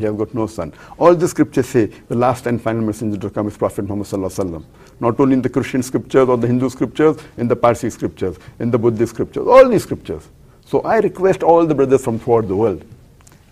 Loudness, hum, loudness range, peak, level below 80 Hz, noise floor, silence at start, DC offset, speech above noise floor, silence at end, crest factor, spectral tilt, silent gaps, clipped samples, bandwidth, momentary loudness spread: -17 LUFS; none; 5 LU; 0 dBFS; -46 dBFS; -46 dBFS; 0 s; under 0.1%; 29 dB; 0.55 s; 16 dB; -7 dB/octave; none; under 0.1%; 15.5 kHz; 11 LU